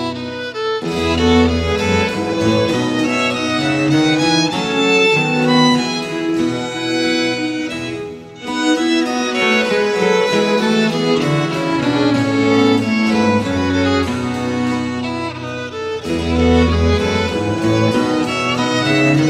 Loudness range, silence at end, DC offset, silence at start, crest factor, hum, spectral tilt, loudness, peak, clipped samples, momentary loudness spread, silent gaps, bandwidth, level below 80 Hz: 4 LU; 0 s; under 0.1%; 0 s; 14 dB; none; -5 dB/octave; -16 LUFS; -2 dBFS; under 0.1%; 9 LU; none; 14 kHz; -34 dBFS